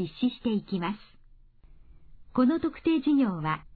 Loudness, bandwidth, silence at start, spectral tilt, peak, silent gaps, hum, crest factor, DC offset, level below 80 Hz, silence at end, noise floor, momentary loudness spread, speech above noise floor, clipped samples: -28 LUFS; 4.7 kHz; 0 s; -10 dB/octave; -14 dBFS; none; none; 16 dB; under 0.1%; -54 dBFS; 0.15 s; -55 dBFS; 9 LU; 28 dB; under 0.1%